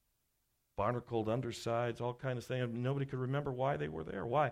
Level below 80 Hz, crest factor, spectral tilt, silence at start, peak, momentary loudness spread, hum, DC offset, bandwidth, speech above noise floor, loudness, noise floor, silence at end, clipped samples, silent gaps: -64 dBFS; 18 dB; -7 dB/octave; 0.75 s; -20 dBFS; 4 LU; none; under 0.1%; 13 kHz; 44 dB; -38 LUFS; -80 dBFS; 0 s; under 0.1%; none